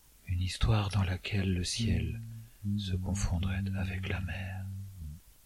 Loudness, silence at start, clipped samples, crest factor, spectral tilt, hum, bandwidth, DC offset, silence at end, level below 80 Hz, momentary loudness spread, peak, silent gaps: -34 LUFS; 0.25 s; under 0.1%; 18 dB; -5.5 dB/octave; none; 14 kHz; under 0.1%; 0.15 s; -44 dBFS; 13 LU; -16 dBFS; none